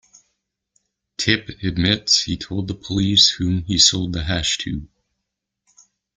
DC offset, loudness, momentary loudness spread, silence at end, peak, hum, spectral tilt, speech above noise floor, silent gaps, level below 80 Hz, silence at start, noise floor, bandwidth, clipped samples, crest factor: under 0.1%; -18 LUFS; 13 LU; 1.3 s; 0 dBFS; none; -3 dB/octave; 60 dB; none; -42 dBFS; 1.2 s; -80 dBFS; 9.6 kHz; under 0.1%; 20 dB